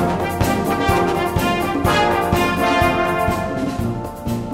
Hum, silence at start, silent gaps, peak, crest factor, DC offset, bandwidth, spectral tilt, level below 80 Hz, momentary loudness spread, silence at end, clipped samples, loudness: none; 0 s; none; -2 dBFS; 16 dB; under 0.1%; 16 kHz; -5.5 dB/octave; -34 dBFS; 8 LU; 0 s; under 0.1%; -18 LUFS